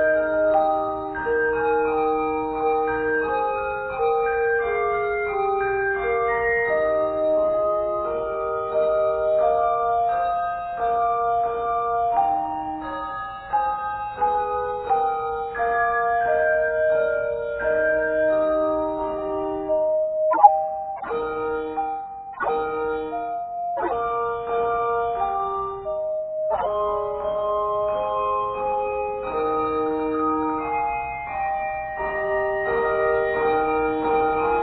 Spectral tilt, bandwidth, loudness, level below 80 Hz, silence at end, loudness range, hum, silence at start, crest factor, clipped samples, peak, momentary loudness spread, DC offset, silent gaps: -9.5 dB/octave; 4.5 kHz; -23 LUFS; -48 dBFS; 0 s; 3 LU; none; 0 s; 22 dB; under 0.1%; 0 dBFS; 7 LU; under 0.1%; none